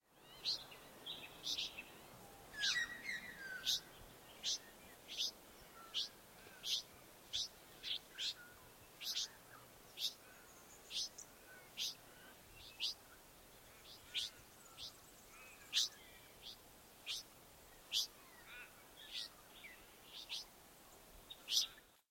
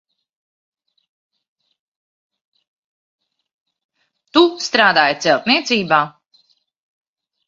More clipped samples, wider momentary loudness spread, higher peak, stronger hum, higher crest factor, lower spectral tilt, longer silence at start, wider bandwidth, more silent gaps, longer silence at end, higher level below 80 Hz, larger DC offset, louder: neither; first, 20 LU vs 5 LU; second, -22 dBFS vs 0 dBFS; neither; about the same, 26 dB vs 22 dB; second, 0.5 dB/octave vs -3.5 dB/octave; second, 0.1 s vs 4.35 s; first, 16.5 kHz vs 7.6 kHz; neither; second, 0.15 s vs 1.4 s; second, -74 dBFS vs -66 dBFS; neither; second, -43 LUFS vs -15 LUFS